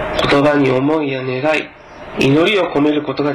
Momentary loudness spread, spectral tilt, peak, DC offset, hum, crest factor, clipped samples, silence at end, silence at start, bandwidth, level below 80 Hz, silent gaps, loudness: 8 LU; -6 dB/octave; -6 dBFS; under 0.1%; none; 10 dB; under 0.1%; 0 s; 0 s; 12 kHz; -42 dBFS; none; -15 LUFS